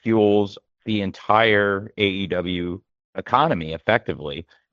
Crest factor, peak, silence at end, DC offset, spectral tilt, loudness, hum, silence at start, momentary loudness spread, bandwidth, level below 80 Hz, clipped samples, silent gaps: 20 dB; -2 dBFS; 0.3 s; under 0.1%; -7 dB/octave; -21 LUFS; none; 0.05 s; 17 LU; 7 kHz; -56 dBFS; under 0.1%; 3.04-3.13 s